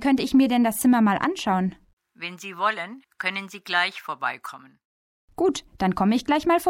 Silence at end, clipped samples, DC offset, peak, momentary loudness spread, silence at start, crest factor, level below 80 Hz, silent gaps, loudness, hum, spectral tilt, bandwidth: 0 s; under 0.1%; under 0.1%; -8 dBFS; 15 LU; 0 s; 16 dB; -56 dBFS; 1.93-1.97 s, 4.85-5.28 s; -23 LUFS; none; -5 dB/octave; 17 kHz